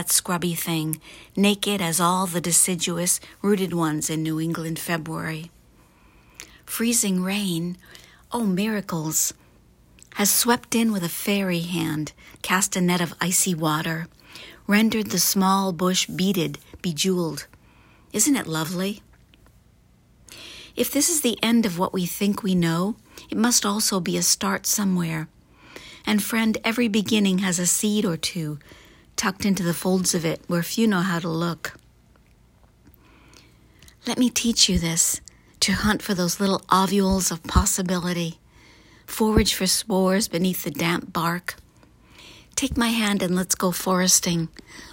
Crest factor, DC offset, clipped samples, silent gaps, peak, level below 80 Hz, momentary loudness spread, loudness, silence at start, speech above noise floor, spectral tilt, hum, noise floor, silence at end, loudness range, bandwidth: 22 dB; under 0.1%; under 0.1%; none; -2 dBFS; -44 dBFS; 13 LU; -22 LUFS; 0 s; 34 dB; -3.5 dB/octave; none; -56 dBFS; 0 s; 5 LU; 16.5 kHz